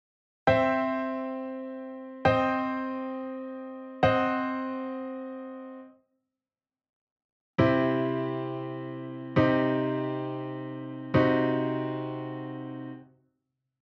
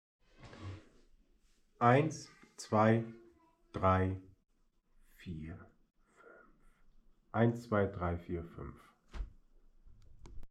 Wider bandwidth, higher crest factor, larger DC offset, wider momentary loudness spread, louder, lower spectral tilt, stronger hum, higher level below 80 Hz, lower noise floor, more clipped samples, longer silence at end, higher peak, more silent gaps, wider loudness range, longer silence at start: second, 6.6 kHz vs 11.5 kHz; second, 20 dB vs 26 dB; neither; second, 15 LU vs 22 LU; first, -29 LUFS vs -33 LUFS; about the same, -8.5 dB/octave vs -7.5 dB/octave; neither; about the same, -58 dBFS vs -56 dBFS; first, under -90 dBFS vs -70 dBFS; neither; first, 0.8 s vs 0.05 s; about the same, -10 dBFS vs -12 dBFS; first, 6.89-7.16 s, 7.24-7.54 s vs none; second, 4 LU vs 8 LU; about the same, 0.45 s vs 0.4 s